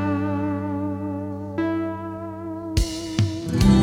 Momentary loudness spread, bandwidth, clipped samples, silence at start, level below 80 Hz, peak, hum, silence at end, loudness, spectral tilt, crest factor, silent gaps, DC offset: 9 LU; 16 kHz; under 0.1%; 0 s; -32 dBFS; -4 dBFS; none; 0 s; -25 LUFS; -6.5 dB/octave; 18 dB; none; under 0.1%